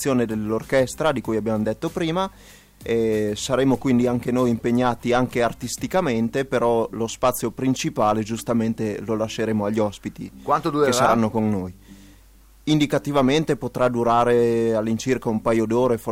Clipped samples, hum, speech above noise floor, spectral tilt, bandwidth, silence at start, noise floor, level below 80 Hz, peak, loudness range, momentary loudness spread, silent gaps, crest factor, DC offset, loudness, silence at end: under 0.1%; none; 29 dB; -5.5 dB/octave; 16.5 kHz; 0 s; -50 dBFS; -48 dBFS; -4 dBFS; 3 LU; 7 LU; none; 18 dB; under 0.1%; -22 LUFS; 0 s